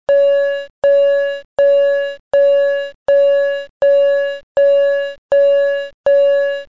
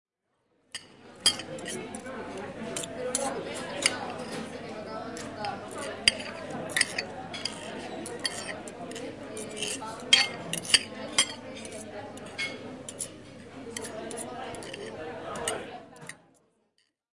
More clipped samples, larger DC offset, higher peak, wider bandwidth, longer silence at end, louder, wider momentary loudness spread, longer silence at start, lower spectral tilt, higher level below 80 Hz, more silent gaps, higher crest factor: neither; first, 0.5% vs under 0.1%; about the same, -6 dBFS vs -4 dBFS; second, 7 kHz vs 11.5 kHz; second, 0.05 s vs 0.95 s; first, -14 LUFS vs -31 LUFS; second, 7 LU vs 16 LU; second, 0.1 s vs 0.75 s; first, -3 dB/octave vs -1 dB/octave; first, -58 dBFS vs -66 dBFS; first, 0.70-0.82 s, 1.45-1.57 s, 2.19-2.31 s, 2.95-3.06 s, 3.70-3.80 s, 4.43-4.55 s, 5.18-5.29 s, 5.94-6.04 s vs none; second, 8 dB vs 30 dB